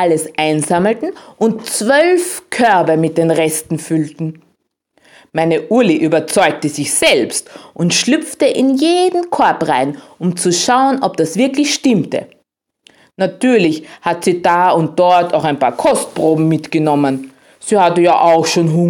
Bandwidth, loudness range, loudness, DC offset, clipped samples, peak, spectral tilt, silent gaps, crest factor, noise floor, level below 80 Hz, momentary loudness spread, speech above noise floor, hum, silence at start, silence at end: 17 kHz; 3 LU; -14 LUFS; under 0.1%; under 0.1%; 0 dBFS; -4.5 dB/octave; none; 14 dB; -63 dBFS; -58 dBFS; 9 LU; 50 dB; none; 0 s; 0 s